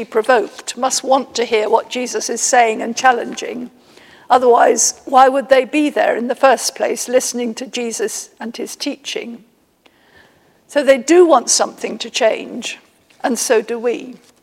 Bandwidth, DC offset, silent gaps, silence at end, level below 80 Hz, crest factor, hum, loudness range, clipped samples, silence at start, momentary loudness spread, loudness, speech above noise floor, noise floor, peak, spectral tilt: 16.5 kHz; under 0.1%; none; 0.3 s; -66 dBFS; 16 dB; none; 8 LU; under 0.1%; 0 s; 15 LU; -15 LUFS; 39 dB; -54 dBFS; 0 dBFS; -1.5 dB/octave